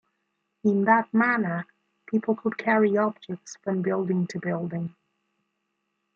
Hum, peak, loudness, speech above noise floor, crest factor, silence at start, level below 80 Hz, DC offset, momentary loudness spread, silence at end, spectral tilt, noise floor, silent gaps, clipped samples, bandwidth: none; -6 dBFS; -25 LUFS; 53 dB; 20 dB; 0.65 s; -74 dBFS; under 0.1%; 13 LU; 1.25 s; -7.5 dB/octave; -78 dBFS; none; under 0.1%; 7.4 kHz